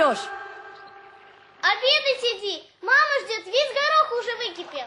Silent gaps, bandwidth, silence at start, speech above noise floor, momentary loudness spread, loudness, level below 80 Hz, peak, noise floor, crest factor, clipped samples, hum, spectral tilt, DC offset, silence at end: none; 11 kHz; 0 s; 25 dB; 17 LU; -22 LUFS; -74 dBFS; -6 dBFS; -50 dBFS; 18 dB; under 0.1%; none; -0.5 dB/octave; under 0.1%; 0 s